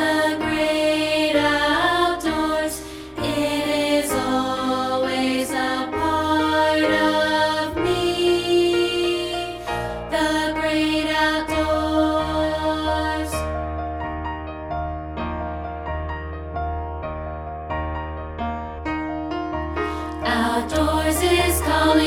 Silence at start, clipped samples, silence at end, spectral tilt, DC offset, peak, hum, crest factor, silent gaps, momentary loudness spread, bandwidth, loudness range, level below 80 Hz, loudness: 0 s; under 0.1%; 0 s; -4.5 dB/octave; under 0.1%; -6 dBFS; none; 16 dB; none; 11 LU; 17.5 kHz; 9 LU; -36 dBFS; -22 LUFS